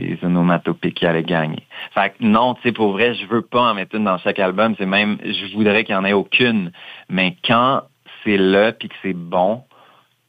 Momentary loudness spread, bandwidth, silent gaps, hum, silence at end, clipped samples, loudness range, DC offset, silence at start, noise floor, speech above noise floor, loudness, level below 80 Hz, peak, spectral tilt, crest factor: 9 LU; 5 kHz; none; none; 0.65 s; under 0.1%; 1 LU; under 0.1%; 0 s; -52 dBFS; 34 dB; -18 LUFS; -60 dBFS; -2 dBFS; -8 dB/octave; 16 dB